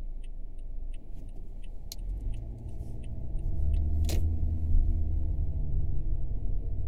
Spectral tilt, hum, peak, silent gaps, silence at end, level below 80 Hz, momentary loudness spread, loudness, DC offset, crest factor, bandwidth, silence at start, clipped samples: -7 dB/octave; none; -14 dBFS; none; 0 s; -30 dBFS; 16 LU; -34 LUFS; under 0.1%; 16 dB; 14.5 kHz; 0 s; under 0.1%